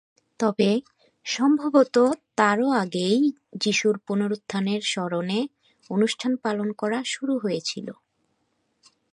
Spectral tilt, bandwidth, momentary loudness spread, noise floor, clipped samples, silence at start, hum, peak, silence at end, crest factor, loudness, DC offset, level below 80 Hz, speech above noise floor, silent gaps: -4.5 dB/octave; 11 kHz; 8 LU; -72 dBFS; under 0.1%; 0.4 s; none; -4 dBFS; 1.2 s; 20 dB; -24 LUFS; under 0.1%; -74 dBFS; 49 dB; none